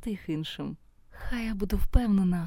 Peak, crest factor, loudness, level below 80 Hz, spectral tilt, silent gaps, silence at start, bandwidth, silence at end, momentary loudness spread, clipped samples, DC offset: -6 dBFS; 22 dB; -30 LUFS; -32 dBFS; -7 dB/octave; none; 0 s; 16.5 kHz; 0 s; 15 LU; under 0.1%; under 0.1%